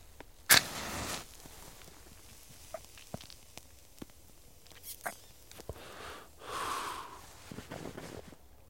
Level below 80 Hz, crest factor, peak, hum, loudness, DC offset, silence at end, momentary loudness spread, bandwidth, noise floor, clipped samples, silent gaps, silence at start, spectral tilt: -60 dBFS; 34 dB; -4 dBFS; none; -32 LUFS; 0.1%; 0.2 s; 18 LU; 16.5 kHz; -58 dBFS; under 0.1%; none; 0 s; -1 dB/octave